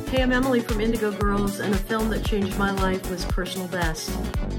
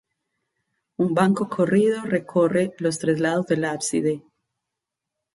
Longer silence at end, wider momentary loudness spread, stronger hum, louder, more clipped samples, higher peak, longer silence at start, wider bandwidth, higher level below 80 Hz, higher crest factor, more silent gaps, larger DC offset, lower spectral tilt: second, 0 s vs 1.15 s; about the same, 6 LU vs 6 LU; neither; second, -25 LUFS vs -22 LUFS; neither; second, -10 dBFS vs -4 dBFS; second, 0 s vs 1 s; first, 18 kHz vs 11.5 kHz; first, -30 dBFS vs -66 dBFS; about the same, 14 dB vs 18 dB; neither; neither; about the same, -5.5 dB/octave vs -6 dB/octave